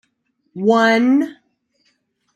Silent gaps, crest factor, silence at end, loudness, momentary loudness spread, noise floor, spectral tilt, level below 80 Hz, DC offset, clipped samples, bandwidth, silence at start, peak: none; 16 dB; 1.05 s; -16 LUFS; 14 LU; -68 dBFS; -5.5 dB/octave; -72 dBFS; under 0.1%; under 0.1%; 9.6 kHz; 0.55 s; -2 dBFS